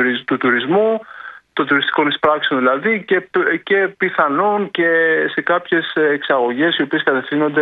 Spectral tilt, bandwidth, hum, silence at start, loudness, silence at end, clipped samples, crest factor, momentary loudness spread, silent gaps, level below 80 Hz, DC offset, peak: -7.5 dB/octave; 4.8 kHz; none; 0 s; -16 LUFS; 0 s; under 0.1%; 16 dB; 3 LU; none; -64 dBFS; under 0.1%; 0 dBFS